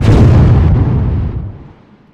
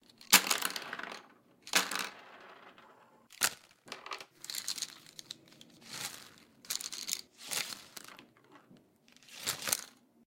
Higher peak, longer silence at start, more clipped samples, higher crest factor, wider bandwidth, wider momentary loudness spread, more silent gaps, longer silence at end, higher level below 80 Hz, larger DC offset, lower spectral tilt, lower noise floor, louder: first, 0 dBFS vs -6 dBFS; second, 0 s vs 0.2 s; neither; second, 8 dB vs 32 dB; second, 8.2 kHz vs 17 kHz; second, 16 LU vs 23 LU; neither; about the same, 0.5 s vs 0.4 s; first, -16 dBFS vs -82 dBFS; neither; first, -9 dB/octave vs 0.5 dB/octave; second, -39 dBFS vs -64 dBFS; first, -10 LUFS vs -33 LUFS